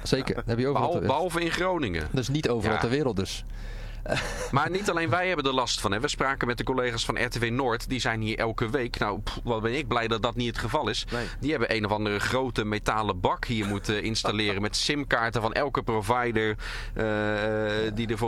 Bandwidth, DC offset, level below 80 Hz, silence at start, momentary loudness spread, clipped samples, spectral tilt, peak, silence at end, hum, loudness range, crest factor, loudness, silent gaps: 15.5 kHz; under 0.1%; -40 dBFS; 0 s; 4 LU; under 0.1%; -4.5 dB/octave; -10 dBFS; 0 s; none; 2 LU; 18 dB; -27 LUFS; none